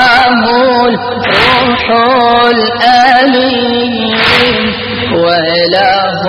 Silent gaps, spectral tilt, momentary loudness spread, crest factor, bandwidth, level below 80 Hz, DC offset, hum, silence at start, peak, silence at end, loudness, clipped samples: none; -5 dB/octave; 5 LU; 8 dB; 12.5 kHz; -38 dBFS; under 0.1%; none; 0 s; 0 dBFS; 0 s; -8 LUFS; 0.4%